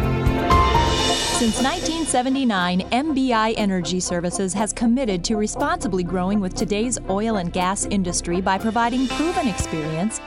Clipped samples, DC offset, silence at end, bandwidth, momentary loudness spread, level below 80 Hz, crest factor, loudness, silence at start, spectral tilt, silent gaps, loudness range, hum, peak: under 0.1%; under 0.1%; 0 s; 16 kHz; 5 LU; -32 dBFS; 16 dB; -21 LUFS; 0 s; -4.5 dB/octave; none; 3 LU; none; -4 dBFS